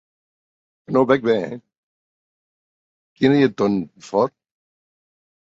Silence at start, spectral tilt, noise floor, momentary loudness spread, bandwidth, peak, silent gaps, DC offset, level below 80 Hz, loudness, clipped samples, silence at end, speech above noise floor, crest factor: 0.9 s; -7 dB/octave; under -90 dBFS; 9 LU; 7.8 kHz; -2 dBFS; 1.78-3.16 s; under 0.1%; -62 dBFS; -19 LUFS; under 0.1%; 1.2 s; over 72 dB; 20 dB